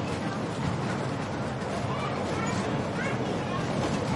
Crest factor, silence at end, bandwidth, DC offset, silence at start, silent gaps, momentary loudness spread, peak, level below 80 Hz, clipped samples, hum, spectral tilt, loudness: 14 dB; 0 s; 11.5 kHz; under 0.1%; 0 s; none; 3 LU; -16 dBFS; -52 dBFS; under 0.1%; none; -6 dB/octave; -30 LUFS